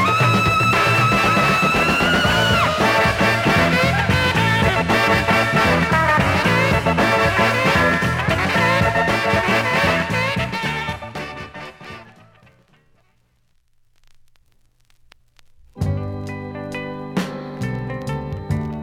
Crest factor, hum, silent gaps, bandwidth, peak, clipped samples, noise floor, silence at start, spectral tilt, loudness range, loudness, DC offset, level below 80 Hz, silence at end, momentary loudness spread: 14 dB; none; none; 17 kHz; -6 dBFS; under 0.1%; -60 dBFS; 0 s; -5 dB/octave; 16 LU; -17 LUFS; under 0.1%; -38 dBFS; 0 s; 14 LU